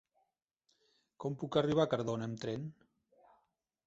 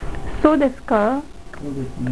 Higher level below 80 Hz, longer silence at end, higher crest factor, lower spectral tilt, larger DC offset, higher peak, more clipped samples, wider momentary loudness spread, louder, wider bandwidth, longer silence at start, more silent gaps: second, -70 dBFS vs -34 dBFS; first, 1.15 s vs 0 s; about the same, 22 dB vs 18 dB; second, -6 dB/octave vs -7.5 dB/octave; neither; second, -16 dBFS vs -2 dBFS; neither; second, 12 LU vs 16 LU; second, -36 LUFS vs -20 LUFS; second, 8 kHz vs 11 kHz; first, 1.2 s vs 0 s; neither